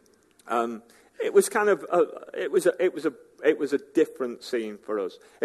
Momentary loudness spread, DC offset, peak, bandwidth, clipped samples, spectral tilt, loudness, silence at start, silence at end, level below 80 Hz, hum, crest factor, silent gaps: 10 LU; under 0.1%; -6 dBFS; 13 kHz; under 0.1%; -4 dB/octave; -26 LUFS; 0.45 s; 0 s; -78 dBFS; none; 20 dB; none